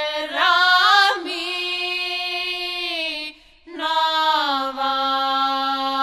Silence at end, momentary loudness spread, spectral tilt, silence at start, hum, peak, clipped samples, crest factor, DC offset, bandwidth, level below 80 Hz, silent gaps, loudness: 0 s; 10 LU; 0 dB/octave; 0 s; none; -2 dBFS; under 0.1%; 18 dB; under 0.1%; 14.5 kHz; -60 dBFS; none; -19 LUFS